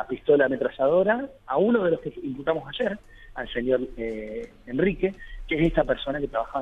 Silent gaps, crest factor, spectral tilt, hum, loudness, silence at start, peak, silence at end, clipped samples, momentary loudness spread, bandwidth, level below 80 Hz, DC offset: none; 18 dB; -8 dB/octave; none; -25 LUFS; 0 s; -8 dBFS; 0 s; under 0.1%; 13 LU; 7.4 kHz; -44 dBFS; under 0.1%